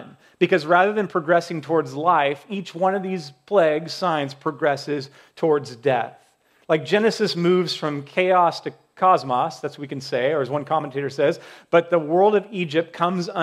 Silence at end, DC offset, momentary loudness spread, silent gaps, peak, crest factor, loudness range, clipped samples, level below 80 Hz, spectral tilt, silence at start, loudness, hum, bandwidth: 0 s; under 0.1%; 11 LU; none; -2 dBFS; 18 dB; 2 LU; under 0.1%; -76 dBFS; -6 dB/octave; 0 s; -21 LUFS; none; 13.5 kHz